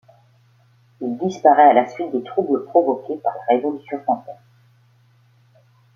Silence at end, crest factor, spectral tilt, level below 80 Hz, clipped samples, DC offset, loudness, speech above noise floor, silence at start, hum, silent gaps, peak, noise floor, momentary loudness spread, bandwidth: 1.6 s; 18 dB; -6.5 dB/octave; -72 dBFS; under 0.1%; under 0.1%; -19 LUFS; 37 dB; 1 s; none; none; -2 dBFS; -56 dBFS; 14 LU; 6.8 kHz